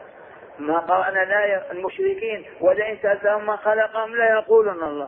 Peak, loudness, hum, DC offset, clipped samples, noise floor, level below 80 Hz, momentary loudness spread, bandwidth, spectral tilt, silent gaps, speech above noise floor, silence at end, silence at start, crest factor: -6 dBFS; -21 LUFS; none; under 0.1%; under 0.1%; -43 dBFS; -64 dBFS; 7 LU; 3.6 kHz; -8 dB/octave; none; 22 dB; 0 s; 0 s; 16 dB